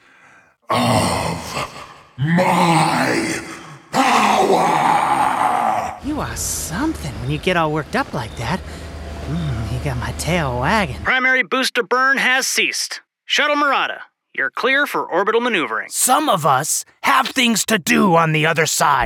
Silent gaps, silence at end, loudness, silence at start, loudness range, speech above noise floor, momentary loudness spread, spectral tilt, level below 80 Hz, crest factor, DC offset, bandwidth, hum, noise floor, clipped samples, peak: none; 0 s; -17 LUFS; 0.7 s; 6 LU; 32 dB; 11 LU; -3.5 dB/octave; -40 dBFS; 16 dB; under 0.1%; 19.5 kHz; none; -50 dBFS; under 0.1%; -2 dBFS